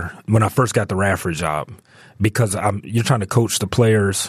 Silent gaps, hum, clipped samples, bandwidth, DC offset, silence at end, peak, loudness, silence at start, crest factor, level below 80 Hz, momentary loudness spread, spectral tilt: none; none; under 0.1%; 14.5 kHz; under 0.1%; 0 s; -4 dBFS; -19 LUFS; 0 s; 14 dB; -46 dBFS; 7 LU; -5 dB/octave